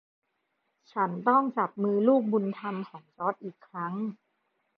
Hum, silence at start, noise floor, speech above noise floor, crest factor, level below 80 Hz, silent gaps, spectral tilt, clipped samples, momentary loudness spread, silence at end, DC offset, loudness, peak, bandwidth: none; 0.95 s; -78 dBFS; 50 dB; 20 dB; -86 dBFS; none; -10 dB/octave; under 0.1%; 15 LU; 0.65 s; under 0.1%; -28 LUFS; -10 dBFS; 5.2 kHz